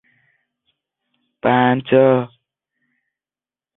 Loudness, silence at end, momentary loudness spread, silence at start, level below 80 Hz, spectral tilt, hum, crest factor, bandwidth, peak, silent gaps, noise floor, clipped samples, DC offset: -16 LUFS; 1.5 s; 9 LU; 1.45 s; -62 dBFS; -11.5 dB/octave; none; 18 dB; 4 kHz; -2 dBFS; none; under -90 dBFS; under 0.1%; under 0.1%